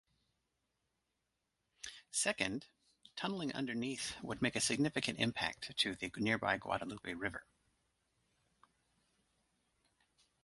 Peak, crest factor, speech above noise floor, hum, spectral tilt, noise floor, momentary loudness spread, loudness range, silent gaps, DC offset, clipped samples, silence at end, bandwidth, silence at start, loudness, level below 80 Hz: -16 dBFS; 24 dB; 48 dB; none; -3 dB/octave; -86 dBFS; 11 LU; 8 LU; none; under 0.1%; under 0.1%; 3 s; 11.5 kHz; 1.85 s; -38 LUFS; -70 dBFS